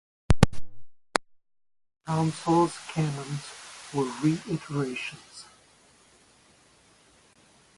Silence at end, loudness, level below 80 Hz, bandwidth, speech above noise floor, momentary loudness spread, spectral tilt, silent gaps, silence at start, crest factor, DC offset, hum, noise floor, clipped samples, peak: 2.35 s; -28 LUFS; -42 dBFS; 12 kHz; 31 dB; 21 LU; -6 dB/octave; none; 0.3 s; 28 dB; under 0.1%; none; -60 dBFS; under 0.1%; 0 dBFS